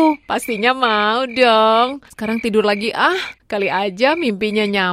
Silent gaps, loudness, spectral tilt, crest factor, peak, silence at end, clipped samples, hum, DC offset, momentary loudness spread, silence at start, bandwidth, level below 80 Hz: none; -17 LUFS; -4.5 dB/octave; 16 dB; 0 dBFS; 0 s; under 0.1%; none; under 0.1%; 9 LU; 0 s; 16 kHz; -56 dBFS